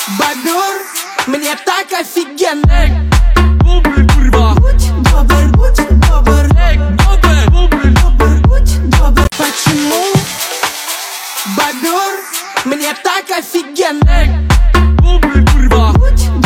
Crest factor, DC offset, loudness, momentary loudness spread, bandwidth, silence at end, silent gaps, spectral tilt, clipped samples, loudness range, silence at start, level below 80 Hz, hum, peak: 8 dB; under 0.1%; -11 LUFS; 7 LU; 16.5 kHz; 0 s; none; -5 dB/octave; under 0.1%; 5 LU; 0 s; -10 dBFS; none; 0 dBFS